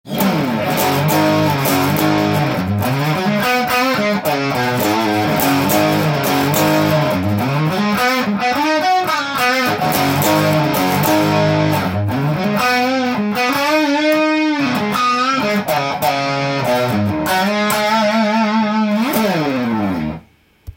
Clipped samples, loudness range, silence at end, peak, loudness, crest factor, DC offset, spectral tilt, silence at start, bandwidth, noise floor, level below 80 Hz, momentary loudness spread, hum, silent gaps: under 0.1%; 1 LU; 0.05 s; 0 dBFS; -15 LUFS; 14 dB; under 0.1%; -5 dB/octave; 0.05 s; 17 kHz; -46 dBFS; -50 dBFS; 4 LU; none; none